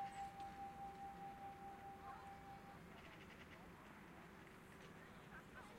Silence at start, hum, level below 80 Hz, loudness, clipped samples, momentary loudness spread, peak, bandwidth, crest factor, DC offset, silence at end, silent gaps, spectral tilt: 0 s; none; -72 dBFS; -57 LUFS; under 0.1%; 7 LU; -42 dBFS; 16 kHz; 16 dB; under 0.1%; 0 s; none; -5 dB/octave